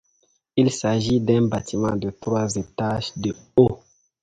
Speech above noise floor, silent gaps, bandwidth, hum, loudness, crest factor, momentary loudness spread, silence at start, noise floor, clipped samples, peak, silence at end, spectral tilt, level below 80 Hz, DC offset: 45 dB; none; 9.4 kHz; none; -22 LUFS; 20 dB; 8 LU; 0.55 s; -66 dBFS; under 0.1%; -2 dBFS; 0.45 s; -6 dB/octave; -48 dBFS; under 0.1%